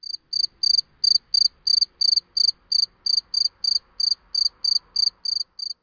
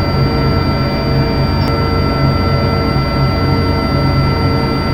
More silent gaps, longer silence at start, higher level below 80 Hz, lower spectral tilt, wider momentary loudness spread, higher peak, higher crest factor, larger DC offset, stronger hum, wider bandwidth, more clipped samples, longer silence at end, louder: neither; first, 0.15 s vs 0 s; second, -64 dBFS vs -22 dBFS; second, 3.5 dB/octave vs -7.5 dB/octave; first, 6 LU vs 1 LU; second, -8 dBFS vs 0 dBFS; about the same, 14 dB vs 12 dB; neither; neither; second, 5.4 kHz vs 16 kHz; neither; about the same, 0.1 s vs 0 s; second, -19 LUFS vs -14 LUFS